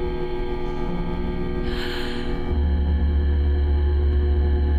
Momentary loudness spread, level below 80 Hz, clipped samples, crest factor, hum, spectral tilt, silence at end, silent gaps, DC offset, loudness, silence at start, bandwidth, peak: 7 LU; -22 dBFS; under 0.1%; 10 dB; none; -8.5 dB/octave; 0 s; none; under 0.1%; -24 LUFS; 0 s; 4.9 kHz; -12 dBFS